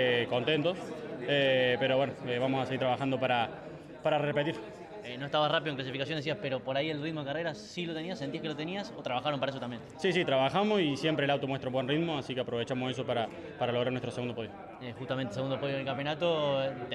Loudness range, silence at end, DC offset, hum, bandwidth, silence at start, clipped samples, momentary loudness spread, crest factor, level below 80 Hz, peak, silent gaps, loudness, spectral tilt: 5 LU; 0 s; under 0.1%; none; 11 kHz; 0 s; under 0.1%; 11 LU; 16 dB; -68 dBFS; -16 dBFS; none; -32 LUFS; -6 dB/octave